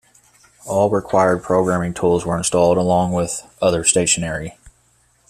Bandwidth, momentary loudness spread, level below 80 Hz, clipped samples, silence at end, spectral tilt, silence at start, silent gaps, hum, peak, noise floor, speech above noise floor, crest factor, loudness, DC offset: 14 kHz; 8 LU; -46 dBFS; under 0.1%; 0.6 s; -4 dB/octave; 0.65 s; none; none; 0 dBFS; -58 dBFS; 41 dB; 18 dB; -18 LUFS; under 0.1%